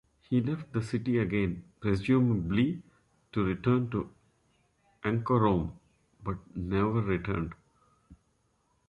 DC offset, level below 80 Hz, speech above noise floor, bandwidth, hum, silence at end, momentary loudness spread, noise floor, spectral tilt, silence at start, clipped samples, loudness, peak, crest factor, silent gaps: under 0.1%; -50 dBFS; 44 dB; 11 kHz; none; 0.75 s; 12 LU; -72 dBFS; -8.5 dB/octave; 0.3 s; under 0.1%; -30 LUFS; -12 dBFS; 18 dB; none